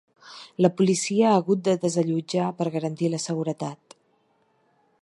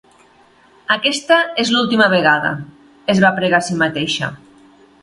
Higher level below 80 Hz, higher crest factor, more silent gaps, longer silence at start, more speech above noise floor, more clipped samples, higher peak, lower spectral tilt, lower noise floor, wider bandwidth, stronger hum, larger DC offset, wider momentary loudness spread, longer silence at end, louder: second, -72 dBFS vs -56 dBFS; about the same, 20 dB vs 18 dB; neither; second, 0.25 s vs 0.9 s; first, 43 dB vs 35 dB; neither; second, -4 dBFS vs 0 dBFS; first, -5.5 dB/octave vs -4 dB/octave; first, -66 dBFS vs -50 dBFS; about the same, 11.5 kHz vs 11.5 kHz; neither; neither; about the same, 13 LU vs 11 LU; first, 1.25 s vs 0.65 s; second, -24 LUFS vs -15 LUFS